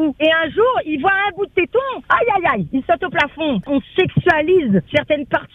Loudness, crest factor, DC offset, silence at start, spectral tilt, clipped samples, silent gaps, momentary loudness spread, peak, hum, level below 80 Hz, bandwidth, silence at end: -17 LUFS; 16 dB; under 0.1%; 0 s; -7.5 dB/octave; under 0.1%; none; 5 LU; 0 dBFS; none; -48 dBFS; 7.2 kHz; 0.1 s